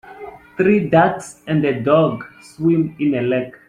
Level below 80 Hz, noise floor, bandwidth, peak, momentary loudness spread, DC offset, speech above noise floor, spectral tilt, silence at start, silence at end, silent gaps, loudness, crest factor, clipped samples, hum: -54 dBFS; -37 dBFS; 11 kHz; -2 dBFS; 19 LU; under 0.1%; 20 dB; -7.5 dB/octave; 0.05 s; 0.2 s; none; -17 LUFS; 16 dB; under 0.1%; none